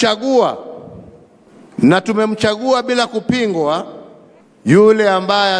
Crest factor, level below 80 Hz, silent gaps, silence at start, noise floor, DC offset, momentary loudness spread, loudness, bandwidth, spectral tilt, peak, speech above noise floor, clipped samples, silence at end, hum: 16 dB; -56 dBFS; none; 0 s; -45 dBFS; under 0.1%; 18 LU; -14 LUFS; 10.5 kHz; -5.5 dB/octave; 0 dBFS; 32 dB; under 0.1%; 0 s; none